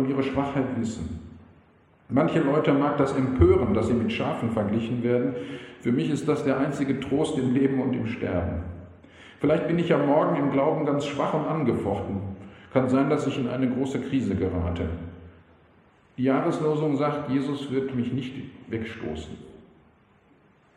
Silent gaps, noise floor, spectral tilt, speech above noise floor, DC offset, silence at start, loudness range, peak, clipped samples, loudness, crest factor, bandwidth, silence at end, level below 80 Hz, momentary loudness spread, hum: none; -59 dBFS; -7.5 dB/octave; 35 dB; under 0.1%; 0 s; 5 LU; -6 dBFS; under 0.1%; -25 LUFS; 20 dB; 10.5 kHz; 1.15 s; -46 dBFS; 13 LU; none